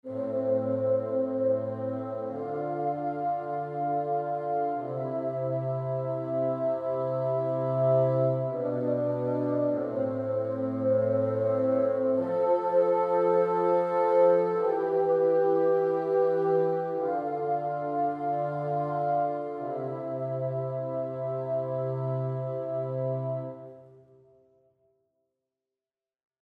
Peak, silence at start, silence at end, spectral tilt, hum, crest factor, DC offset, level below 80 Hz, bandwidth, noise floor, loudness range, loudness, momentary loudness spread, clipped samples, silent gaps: -12 dBFS; 0.05 s; 2.6 s; -10.5 dB/octave; none; 16 dB; under 0.1%; -76 dBFS; 4.9 kHz; under -90 dBFS; 8 LU; -28 LUFS; 8 LU; under 0.1%; none